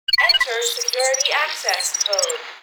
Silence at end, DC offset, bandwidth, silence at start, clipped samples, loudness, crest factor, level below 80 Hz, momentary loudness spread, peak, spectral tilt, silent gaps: 0.05 s; under 0.1%; over 20 kHz; 0.1 s; under 0.1%; -18 LUFS; 18 dB; -56 dBFS; 6 LU; -4 dBFS; 4 dB/octave; none